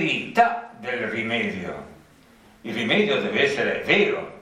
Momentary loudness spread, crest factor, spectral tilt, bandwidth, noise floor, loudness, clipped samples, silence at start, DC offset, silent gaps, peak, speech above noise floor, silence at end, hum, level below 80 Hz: 13 LU; 20 dB; -5 dB/octave; 14.5 kHz; -53 dBFS; -22 LUFS; under 0.1%; 0 s; under 0.1%; none; -4 dBFS; 30 dB; 0 s; none; -62 dBFS